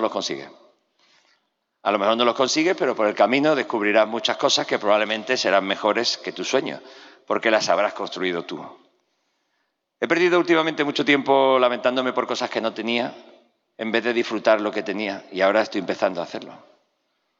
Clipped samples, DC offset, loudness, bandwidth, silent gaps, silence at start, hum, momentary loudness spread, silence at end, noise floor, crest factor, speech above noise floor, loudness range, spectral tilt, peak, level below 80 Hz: under 0.1%; under 0.1%; -21 LUFS; 8 kHz; none; 0 s; none; 11 LU; 0.85 s; -73 dBFS; 18 dB; 52 dB; 4 LU; -3.5 dB/octave; -4 dBFS; -80 dBFS